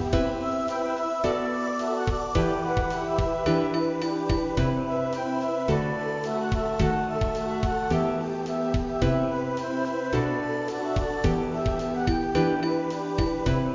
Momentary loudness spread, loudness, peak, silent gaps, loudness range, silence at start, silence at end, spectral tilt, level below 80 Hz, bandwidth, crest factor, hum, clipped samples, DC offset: 4 LU; -26 LUFS; -8 dBFS; none; 1 LU; 0 s; 0 s; -7 dB/octave; -36 dBFS; 7.6 kHz; 16 dB; none; under 0.1%; under 0.1%